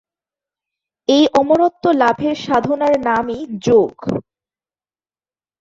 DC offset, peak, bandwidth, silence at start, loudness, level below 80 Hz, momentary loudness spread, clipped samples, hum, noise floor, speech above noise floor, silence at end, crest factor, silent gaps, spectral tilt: under 0.1%; -2 dBFS; 7.8 kHz; 1.1 s; -16 LUFS; -54 dBFS; 11 LU; under 0.1%; none; under -90 dBFS; over 75 dB; 1.4 s; 16 dB; none; -5.5 dB/octave